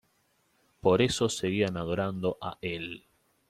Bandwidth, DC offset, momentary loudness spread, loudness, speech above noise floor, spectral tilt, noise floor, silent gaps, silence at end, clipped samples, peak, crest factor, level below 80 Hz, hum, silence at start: 14.5 kHz; under 0.1%; 12 LU; -29 LUFS; 42 dB; -5 dB/octave; -71 dBFS; none; 0.5 s; under 0.1%; -10 dBFS; 20 dB; -60 dBFS; none; 0.85 s